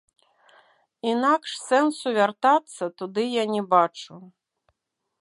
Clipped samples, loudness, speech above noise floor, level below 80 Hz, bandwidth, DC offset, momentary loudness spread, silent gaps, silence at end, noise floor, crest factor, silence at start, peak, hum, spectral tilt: under 0.1%; -23 LUFS; 56 dB; -82 dBFS; 11.5 kHz; under 0.1%; 11 LU; none; 0.95 s; -79 dBFS; 20 dB; 1.05 s; -6 dBFS; none; -4 dB/octave